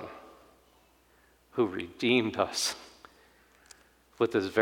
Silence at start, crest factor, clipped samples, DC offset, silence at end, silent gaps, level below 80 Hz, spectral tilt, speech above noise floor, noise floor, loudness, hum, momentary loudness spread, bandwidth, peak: 0 s; 22 dB; under 0.1%; under 0.1%; 0 s; none; -68 dBFS; -3.5 dB/octave; 35 dB; -64 dBFS; -29 LUFS; 60 Hz at -65 dBFS; 19 LU; 19 kHz; -10 dBFS